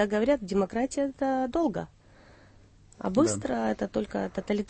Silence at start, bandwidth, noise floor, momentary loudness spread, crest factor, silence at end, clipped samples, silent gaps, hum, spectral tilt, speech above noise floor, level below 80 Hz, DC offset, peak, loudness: 0 s; 8.8 kHz; -56 dBFS; 7 LU; 18 dB; 0.05 s; under 0.1%; none; none; -5.5 dB/octave; 28 dB; -54 dBFS; under 0.1%; -12 dBFS; -29 LUFS